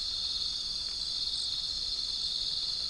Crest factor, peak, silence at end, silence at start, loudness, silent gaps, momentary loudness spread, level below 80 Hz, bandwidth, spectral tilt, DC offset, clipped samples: 14 dB; -20 dBFS; 0 s; 0 s; -31 LUFS; none; 2 LU; -54 dBFS; 10.5 kHz; 0 dB/octave; under 0.1%; under 0.1%